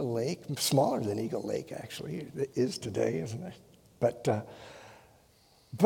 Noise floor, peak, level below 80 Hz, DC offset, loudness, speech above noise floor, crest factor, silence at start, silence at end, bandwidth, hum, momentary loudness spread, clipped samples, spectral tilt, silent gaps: -63 dBFS; -6 dBFS; -68 dBFS; under 0.1%; -32 LUFS; 31 dB; 26 dB; 0 s; 0 s; 17.5 kHz; none; 19 LU; under 0.1%; -5.5 dB/octave; none